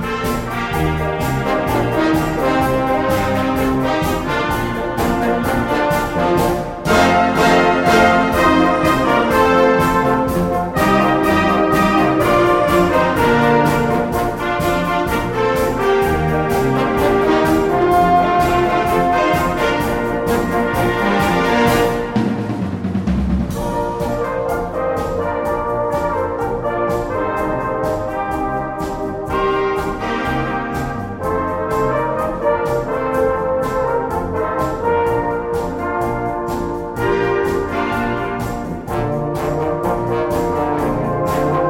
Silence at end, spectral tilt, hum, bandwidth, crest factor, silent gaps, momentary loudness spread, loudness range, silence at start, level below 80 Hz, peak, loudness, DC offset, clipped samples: 0 s; -6 dB/octave; none; 16.5 kHz; 16 dB; none; 8 LU; 6 LU; 0 s; -32 dBFS; 0 dBFS; -17 LUFS; under 0.1%; under 0.1%